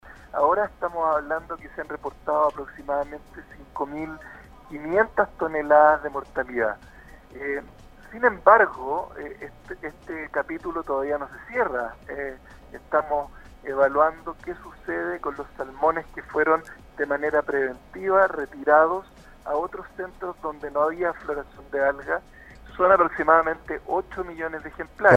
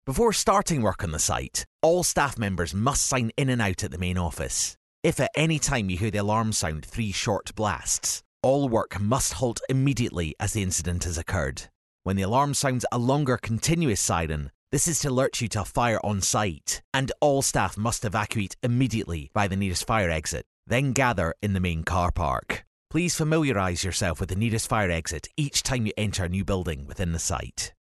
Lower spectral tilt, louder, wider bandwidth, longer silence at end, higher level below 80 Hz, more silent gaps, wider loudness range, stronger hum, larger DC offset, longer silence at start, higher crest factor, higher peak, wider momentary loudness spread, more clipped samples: first, -7 dB/octave vs -4 dB/octave; about the same, -24 LUFS vs -26 LUFS; second, 9.8 kHz vs 12.5 kHz; about the same, 0 s vs 0.1 s; second, -50 dBFS vs -42 dBFS; second, none vs 1.67-1.79 s, 4.77-5.03 s, 8.25-8.40 s, 11.75-11.99 s, 14.54-14.67 s, 16.84-16.92 s, 20.46-20.63 s, 22.67-22.86 s; first, 6 LU vs 2 LU; neither; neither; about the same, 0.05 s vs 0.05 s; about the same, 24 dB vs 22 dB; first, 0 dBFS vs -4 dBFS; first, 18 LU vs 7 LU; neither